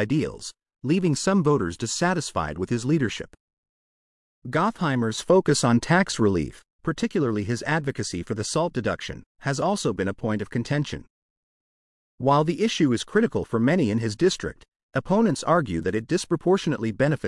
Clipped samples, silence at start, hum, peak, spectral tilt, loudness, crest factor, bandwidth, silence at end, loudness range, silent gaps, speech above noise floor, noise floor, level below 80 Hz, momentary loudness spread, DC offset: under 0.1%; 0 s; none; -6 dBFS; -5.5 dB/octave; -24 LUFS; 18 dB; 12 kHz; 0 s; 4 LU; 3.40-3.63 s, 3.69-4.42 s, 6.70-6.79 s, 9.26-9.35 s, 11.10-12.18 s, 14.68-14.72 s, 14.83-14.89 s; over 67 dB; under -90 dBFS; -52 dBFS; 10 LU; under 0.1%